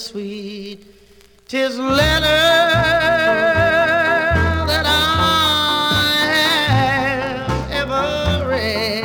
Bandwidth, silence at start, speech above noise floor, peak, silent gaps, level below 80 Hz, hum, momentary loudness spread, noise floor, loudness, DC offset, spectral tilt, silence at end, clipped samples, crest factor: over 20 kHz; 0 s; 30 dB; -2 dBFS; none; -34 dBFS; none; 9 LU; -47 dBFS; -15 LUFS; under 0.1%; -4 dB/octave; 0 s; under 0.1%; 14 dB